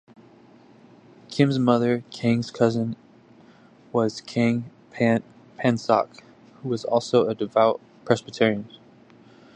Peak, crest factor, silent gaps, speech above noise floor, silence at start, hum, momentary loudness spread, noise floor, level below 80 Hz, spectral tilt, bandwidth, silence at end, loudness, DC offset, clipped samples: -4 dBFS; 22 dB; none; 30 dB; 1.3 s; none; 12 LU; -52 dBFS; -66 dBFS; -6.5 dB/octave; 9.4 kHz; 0.9 s; -24 LUFS; under 0.1%; under 0.1%